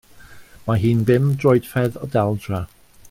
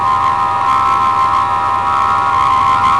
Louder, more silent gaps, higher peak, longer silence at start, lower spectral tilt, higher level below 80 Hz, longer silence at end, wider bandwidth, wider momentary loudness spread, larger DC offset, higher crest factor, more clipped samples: second, -19 LUFS vs -12 LUFS; neither; about the same, -4 dBFS vs -4 dBFS; first, 0.2 s vs 0 s; first, -8 dB/octave vs -4 dB/octave; second, -48 dBFS vs -40 dBFS; first, 0.45 s vs 0 s; first, 16 kHz vs 11 kHz; first, 12 LU vs 3 LU; second, under 0.1% vs 0.9%; first, 16 dB vs 8 dB; neither